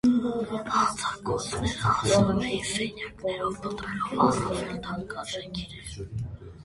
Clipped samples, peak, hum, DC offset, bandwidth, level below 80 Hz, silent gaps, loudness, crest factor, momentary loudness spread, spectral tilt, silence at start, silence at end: under 0.1%; -8 dBFS; none; under 0.1%; 11.5 kHz; -46 dBFS; none; -28 LUFS; 20 dB; 14 LU; -5 dB/octave; 0.05 s; 0 s